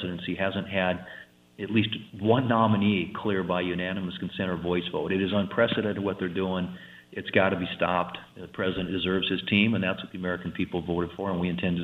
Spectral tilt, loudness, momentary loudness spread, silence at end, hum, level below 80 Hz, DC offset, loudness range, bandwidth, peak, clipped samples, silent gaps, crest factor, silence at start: -8 dB/octave; -27 LUFS; 10 LU; 0 s; none; -58 dBFS; under 0.1%; 2 LU; 4.9 kHz; -6 dBFS; under 0.1%; none; 22 dB; 0 s